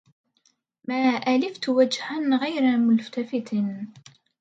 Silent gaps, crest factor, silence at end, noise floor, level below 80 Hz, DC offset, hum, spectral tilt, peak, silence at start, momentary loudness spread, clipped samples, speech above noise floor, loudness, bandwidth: none; 16 dB; 0.5 s; -68 dBFS; -76 dBFS; under 0.1%; none; -5.5 dB/octave; -8 dBFS; 0.9 s; 9 LU; under 0.1%; 45 dB; -24 LUFS; 8 kHz